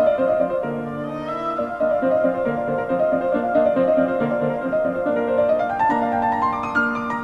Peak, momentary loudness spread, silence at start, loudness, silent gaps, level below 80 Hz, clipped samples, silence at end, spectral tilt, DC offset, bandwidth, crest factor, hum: -6 dBFS; 6 LU; 0 s; -21 LUFS; none; -52 dBFS; under 0.1%; 0 s; -8 dB/octave; under 0.1%; 7.4 kHz; 14 dB; none